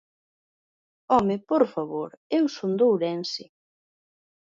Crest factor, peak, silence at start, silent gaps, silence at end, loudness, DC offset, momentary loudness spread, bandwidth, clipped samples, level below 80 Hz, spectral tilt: 20 dB; -6 dBFS; 1.1 s; 2.17-2.30 s; 1.15 s; -25 LUFS; under 0.1%; 10 LU; 7.6 kHz; under 0.1%; -64 dBFS; -6.5 dB/octave